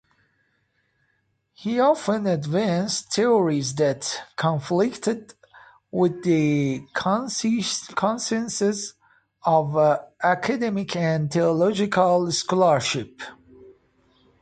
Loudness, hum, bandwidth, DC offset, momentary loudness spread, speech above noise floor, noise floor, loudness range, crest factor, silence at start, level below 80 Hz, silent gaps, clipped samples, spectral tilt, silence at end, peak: -23 LUFS; none; 9.4 kHz; under 0.1%; 9 LU; 48 dB; -70 dBFS; 3 LU; 18 dB; 1.6 s; -64 dBFS; none; under 0.1%; -5 dB/octave; 0.7 s; -6 dBFS